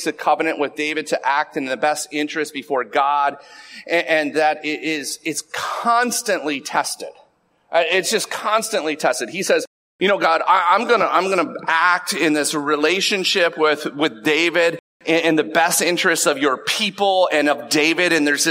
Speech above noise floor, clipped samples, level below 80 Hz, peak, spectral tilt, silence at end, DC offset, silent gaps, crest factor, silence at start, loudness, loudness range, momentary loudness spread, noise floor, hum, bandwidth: 39 dB; under 0.1%; -72 dBFS; -2 dBFS; -2 dB/octave; 0 s; under 0.1%; 9.67-9.99 s, 14.79-15.00 s; 16 dB; 0 s; -18 LUFS; 4 LU; 7 LU; -58 dBFS; none; 16 kHz